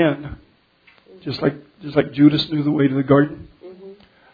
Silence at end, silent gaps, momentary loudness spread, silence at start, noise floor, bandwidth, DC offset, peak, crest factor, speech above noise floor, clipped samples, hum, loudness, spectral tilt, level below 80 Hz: 0.4 s; none; 22 LU; 0 s; -55 dBFS; 5 kHz; under 0.1%; -2 dBFS; 18 dB; 37 dB; under 0.1%; none; -19 LUFS; -9 dB/octave; -50 dBFS